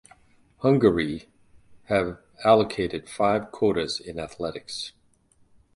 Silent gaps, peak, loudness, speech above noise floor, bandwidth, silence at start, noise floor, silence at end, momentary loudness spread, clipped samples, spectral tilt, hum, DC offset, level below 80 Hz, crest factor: none; -4 dBFS; -25 LUFS; 38 dB; 11.5 kHz; 0.6 s; -62 dBFS; 0.85 s; 14 LU; under 0.1%; -6 dB/octave; none; under 0.1%; -52 dBFS; 22 dB